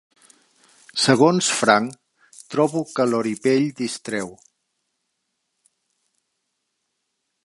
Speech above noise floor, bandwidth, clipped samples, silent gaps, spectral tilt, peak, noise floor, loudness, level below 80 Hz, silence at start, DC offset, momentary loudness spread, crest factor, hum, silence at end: 57 dB; 11.5 kHz; under 0.1%; none; -4 dB/octave; -2 dBFS; -76 dBFS; -20 LUFS; -70 dBFS; 0.95 s; under 0.1%; 13 LU; 22 dB; none; 3.1 s